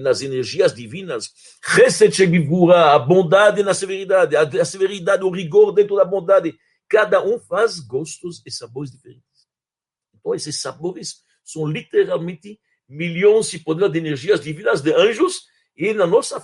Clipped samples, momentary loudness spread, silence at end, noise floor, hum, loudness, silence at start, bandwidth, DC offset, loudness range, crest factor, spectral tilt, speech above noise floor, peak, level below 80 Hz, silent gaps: under 0.1%; 17 LU; 0.05 s; under -90 dBFS; none; -17 LUFS; 0 s; 11.5 kHz; under 0.1%; 12 LU; 16 dB; -5 dB/octave; over 73 dB; 0 dBFS; -64 dBFS; none